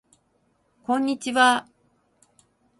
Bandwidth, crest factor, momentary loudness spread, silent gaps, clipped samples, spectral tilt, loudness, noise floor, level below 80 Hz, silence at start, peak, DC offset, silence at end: 11.5 kHz; 24 dB; 8 LU; none; under 0.1%; -2 dB/octave; -22 LUFS; -68 dBFS; -72 dBFS; 0.9 s; -4 dBFS; under 0.1%; 1.15 s